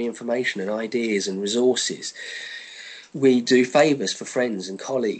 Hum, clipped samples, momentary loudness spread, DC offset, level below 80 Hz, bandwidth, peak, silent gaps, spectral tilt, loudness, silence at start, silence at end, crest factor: none; under 0.1%; 15 LU; under 0.1%; -74 dBFS; 9.2 kHz; -6 dBFS; none; -3.5 dB/octave; -22 LUFS; 0 s; 0 s; 18 dB